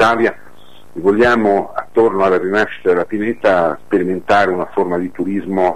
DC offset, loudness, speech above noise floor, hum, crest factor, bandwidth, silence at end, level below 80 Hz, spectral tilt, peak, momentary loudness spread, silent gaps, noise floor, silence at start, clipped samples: 2%; -15 LUFS; 30 dB; none; 12 dB; 13 kHz; 0 s; -48 dBFS; -6.5 dB/octave; -2 dBFS; 7 LU; none; -45 dBFS; 0 s; under 0.1%